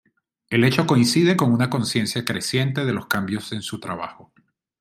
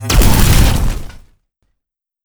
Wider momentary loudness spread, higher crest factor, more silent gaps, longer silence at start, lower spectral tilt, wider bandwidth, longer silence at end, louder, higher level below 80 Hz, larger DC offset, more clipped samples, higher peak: about the same, 12 LU vs 12 LU; first, 20 dB vs 12 dB; neither; first, 0.5 s vs 0 s; about the same, -5 dB/octave vs -4.5 dB/octave; second, 16 kHz vs over 20 kHz; second, 0.65 s vs 1.15 s; second, -21 LUFS vs -13 LUFS; second, -60 dBFS vs -16 dBFS; neither; neither; about the same, -2 dBFS vs 0 dBFS